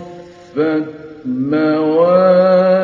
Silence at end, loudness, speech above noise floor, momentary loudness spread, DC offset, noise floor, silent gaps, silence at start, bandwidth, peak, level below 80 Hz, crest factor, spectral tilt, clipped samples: 0 s; -13 LUFS; 22 dB; 17 LU; under 0.1%; -35 dBFS; none; 0 s; 5.6 kHz; 0 dBFS; -60 dBFS; 14 dB; -9 dB/octave; under 0.1%